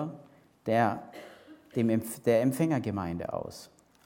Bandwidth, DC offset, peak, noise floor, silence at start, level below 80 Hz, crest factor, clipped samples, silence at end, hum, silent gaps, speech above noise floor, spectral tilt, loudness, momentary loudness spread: 17.5 kHz; under 0.1%; -12 dBFS; -56 dBFS; 0 s; -64 dBFS; 20 dB; under 0.1%; 0.4 s; none; none; 27 dB; -6.5 dB/octave; -30 LUFS; 22 LU